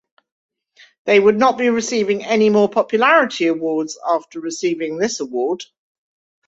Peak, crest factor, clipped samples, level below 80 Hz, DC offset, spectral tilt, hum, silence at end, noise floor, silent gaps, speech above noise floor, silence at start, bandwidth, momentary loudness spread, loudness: -2 dBFS; 16 dB; under 0.1%; -64 dBFS; under 0.1%; -4 dB/octave; none; 0.85 s; -52 dBFS; none; 35 dB; 1.05 s; 8 kHz; 9 LU; -17 LUFS